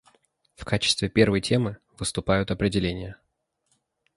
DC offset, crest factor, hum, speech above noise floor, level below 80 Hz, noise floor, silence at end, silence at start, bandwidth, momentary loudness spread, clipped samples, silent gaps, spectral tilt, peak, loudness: under 0.1%; 22 dB; none; 49 dB; -46 dBFS; -73 dBFS; 1 s; 0.6 s; 11.5 kHz; 12 LU; under 0.1%; none; -5 dB/octave; -4 dBFS; -24 LUFS